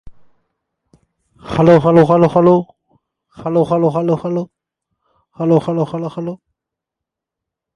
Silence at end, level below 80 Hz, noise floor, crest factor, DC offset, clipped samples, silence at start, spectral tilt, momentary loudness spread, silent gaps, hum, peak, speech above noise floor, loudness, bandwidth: 1.4 s; -50 dBFS; -83 dBFS; 16 dB; under 0.1%; under 0.1%; 0.05 s; -9 dB/octave; 17 LU; none; none; 0 dBFS; 70 dB; -14 LUFS; 9.8 kHz